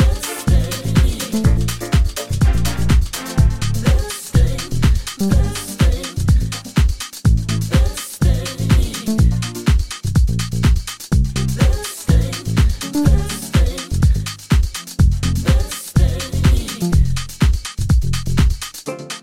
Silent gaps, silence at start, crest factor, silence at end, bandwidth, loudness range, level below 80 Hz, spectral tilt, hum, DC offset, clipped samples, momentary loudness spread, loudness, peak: none; 0 s; 14 dB; 0 s; 16.5 kHz; 1 LU; -18 dBFS; -5.5 dB/octave; none; under 0.1%; under 0.1%; 4 LU; -18 LUFS; -2 dBFS